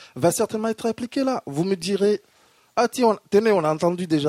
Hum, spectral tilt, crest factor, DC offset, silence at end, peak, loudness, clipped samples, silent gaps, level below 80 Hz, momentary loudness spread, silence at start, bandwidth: none; -5.5 dB/octave; 16 dB; under 0.1%; 0 s; -6 dBFS; -22 LUFS; under 0.1%; none; -64 dBFS; 7 LU; 0 s; 16 kHz